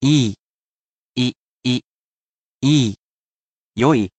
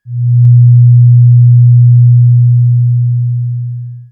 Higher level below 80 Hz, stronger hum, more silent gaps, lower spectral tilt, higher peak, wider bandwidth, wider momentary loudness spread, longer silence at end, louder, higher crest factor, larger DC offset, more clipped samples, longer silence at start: about the same, -56 dBFS vs -56 dBFS; neither; first, 0.39-1.14 s, 1.36-1.61 s, 1.84-2.60 s, 2.99-3.72 s vs none; second, -5.5 dB/octave vs -15.5 dB/octave; second, -4 dBFS vs 0 dBFS; first, 9 kHz vs 0.2 kHz; first, 15 LU vs 11 LU; about the same, 0.1 s vs 0.1 s; second, -20 LUFS vs -7 LUFS; first, 18 dB vs 6 dB; neither; neither; about the same, 0 s vs 0.05 s